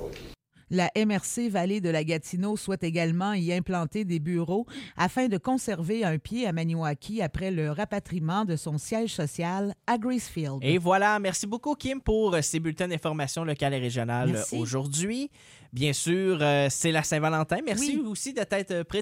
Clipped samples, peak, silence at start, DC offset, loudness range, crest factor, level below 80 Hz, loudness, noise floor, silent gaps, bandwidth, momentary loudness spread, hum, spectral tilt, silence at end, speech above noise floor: under 0.1%; -10 dBFS; 0 s; under 0.1%; 3 LU; 18 dB; -52 dBFS; -28 LUFS; -48 dBFS; none; 16.5 kHz; 7 LU; none; -5 dB/octave; 0 s; 20 dB